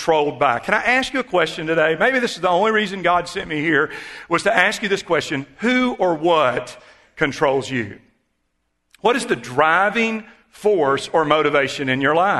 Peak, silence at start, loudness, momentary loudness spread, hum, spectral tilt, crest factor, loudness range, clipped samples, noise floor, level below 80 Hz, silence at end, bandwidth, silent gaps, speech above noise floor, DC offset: 0 dBFS; 0 s; -19 LUFS; 7 LU; none; -4.5 dB/octave; 20 dB; 3 LU; under 0.1%; -71 dBFS; -54 dBFS; 0 s; 12.5 kHz; none; 53 dB; under 0.1%